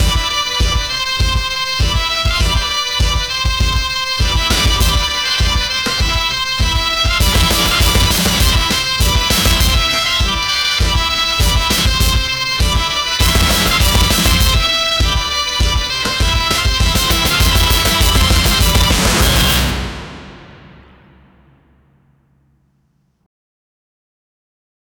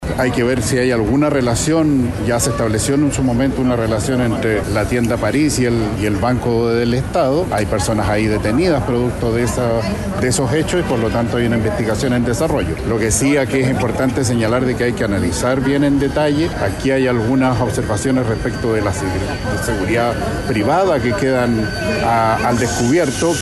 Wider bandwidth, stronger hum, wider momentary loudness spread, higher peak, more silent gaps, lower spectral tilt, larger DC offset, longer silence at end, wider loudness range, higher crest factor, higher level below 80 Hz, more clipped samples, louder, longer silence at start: first, over 20 kHz vs 13 kHz; neither; about the same, 4 LU vs 4 LU; about the same, 0 dBFS vs -2 dBFS; neither; second, -3 dB/octave vs -5.5 dB/octave; neither; first, 4.3 s vs 0 s; about the same, 3 LU vs 1 LU; about the same, 14 dB vs 14 dB; first, -20 dBFS vs -32 dBFS; neither; first, -13 LUFS vs -16 LUFS; about the same, 0 s vs 0 s